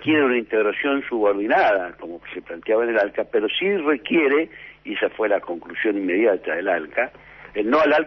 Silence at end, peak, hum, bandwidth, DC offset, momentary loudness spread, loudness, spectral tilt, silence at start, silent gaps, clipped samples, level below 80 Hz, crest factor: 0 s; -6 dBFS; none; 6.2 kHz; under 0.1%; 13 LU; -21 LUFS; -6.5 dB/octave; 0 s; none; under 0.1%; -60 dBFS; 14 dB